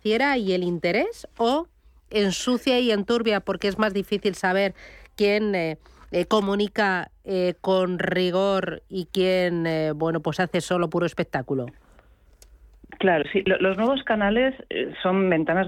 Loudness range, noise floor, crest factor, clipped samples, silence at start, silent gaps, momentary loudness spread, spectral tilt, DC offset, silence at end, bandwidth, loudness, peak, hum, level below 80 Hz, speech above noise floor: 2 LU; -55 dBFS; 16 dB; under 0.1%; 0.05 s; none; 8 LU; -5.5 dB/octave; under 0.1%; 0 s; 15 kHz; -24 LUFS; -8 dBFS; none; -52 dBFS; 31 dB